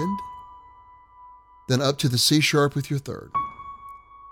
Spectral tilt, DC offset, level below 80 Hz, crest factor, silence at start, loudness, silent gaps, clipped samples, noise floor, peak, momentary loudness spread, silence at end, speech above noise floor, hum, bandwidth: -4.5 dB/octave; under 0.1%; -56 dBFS; 20 dB; 0 s; -23 LUFS; none; under 0.1%; -50 dBFS; -6 dBFS; 25 LU; 0 s; 28 dB; none; 17.5 kHz